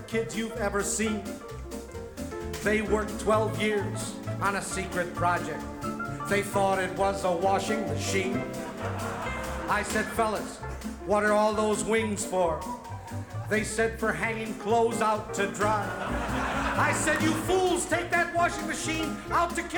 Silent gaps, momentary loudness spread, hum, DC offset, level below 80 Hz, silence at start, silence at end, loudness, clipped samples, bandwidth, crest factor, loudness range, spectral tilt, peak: none; 11 LU; none; under 0.1%; -46 dBFS; 0 s; 0 s; -28 LUFS; under 0.1%; 19 kHz; 16 dB; 3 LU; -4.5 dB/octave; -12 dBFS